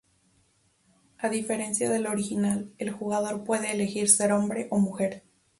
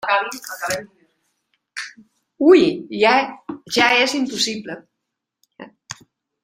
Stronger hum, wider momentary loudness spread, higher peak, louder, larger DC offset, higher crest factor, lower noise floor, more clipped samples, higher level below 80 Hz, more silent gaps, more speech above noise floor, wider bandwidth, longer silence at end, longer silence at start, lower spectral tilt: neither; second, 11 LU vs 22 LU; about the same, -4 dBFS vs -2 dBFS; second, -27 LUFS vs -18 LUFS; neither; about the same, 24 dB vs 20 dB; second, -67 dBFS vs -80 dBFS; neither; second, -68 dBFS vs -62 dBFS; neither; second, 40 dB vs 62 dB; second, 12 kHz vs 16.5 kHz; about the same, 0.4 s vs 0.5 s; first, 1.2 s vs 0.05 s; about the same, -4 dB/octave vs -3 dB/octave